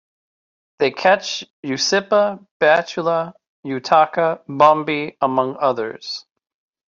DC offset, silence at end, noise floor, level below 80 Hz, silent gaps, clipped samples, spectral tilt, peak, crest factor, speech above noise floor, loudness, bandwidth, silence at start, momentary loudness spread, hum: under 0.1%; 0.7 s; under -90 dBFS; -66 dBFS; 1.50-1.63 s, 2.51-2.60 s, 3.48-3.63 s; under 0.1%; -3.5 dB/octave; -2 dBFS; 18 dB; over 72 dB; -18 LUFS; 7.6 kHz; 0.8 s; 13 LU; none